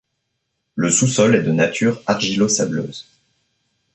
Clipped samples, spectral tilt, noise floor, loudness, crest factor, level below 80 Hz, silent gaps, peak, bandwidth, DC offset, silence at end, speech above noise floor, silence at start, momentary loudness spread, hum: under 0.1%; -4 dB/octave; -74 dBFS; -17 LUFS; 16 dB; -58 dBFS; none; -2 dBFS; 8.6 kHz; under 0.1%; 0.95 s; 56 dB; 0.75 s; 14 LU; none